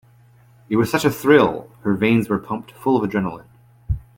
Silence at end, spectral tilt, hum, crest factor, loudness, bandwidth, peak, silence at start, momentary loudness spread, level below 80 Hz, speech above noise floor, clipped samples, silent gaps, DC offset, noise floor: 0.2 s; -6.5 dB/octave; none; 18 dB; -20 LUFS; 17 kHz; -2 dBFS; 0.7 s; 14 LU; -40 dBFS; 33 dB; under 0.1%; none; under 0.1%; -51 dBFS